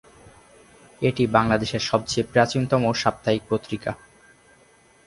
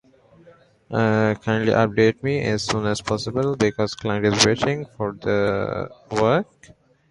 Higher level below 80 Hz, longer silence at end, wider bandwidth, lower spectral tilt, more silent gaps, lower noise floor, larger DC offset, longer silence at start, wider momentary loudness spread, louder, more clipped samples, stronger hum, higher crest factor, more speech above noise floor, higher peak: about the same, -50 dBFS vs -50 dBFS; first, 1.1 s vs 0.7 s; about the same, 11.5 kHz vs 11.5 kHz; about the same, -5.5 dB/octave vs -5 dB/octave; neither; first, -56 dBFS vs -52 dBFS; neither; second, 0.25 s vs 0.9 s; about the same, 10 LU vs 10 LU; about the same, -23 LUFS vs -21 LUFS; neither; neither; about the same, 22 dB vs 22 dB; about the same, 34 dB vs 31 dB; about the same, -2 dBFS vs 0 dBFS